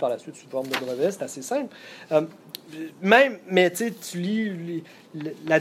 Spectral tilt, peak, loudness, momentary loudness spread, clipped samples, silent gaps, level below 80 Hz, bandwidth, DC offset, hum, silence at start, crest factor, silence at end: -4.5 dB/octave; -2 dBFS; -24 LUFS; 19 LU; under 0.1%; none; -74 dBFS; 16 kHz; under 0.1%; none; 0 s; 24 dB; 0 s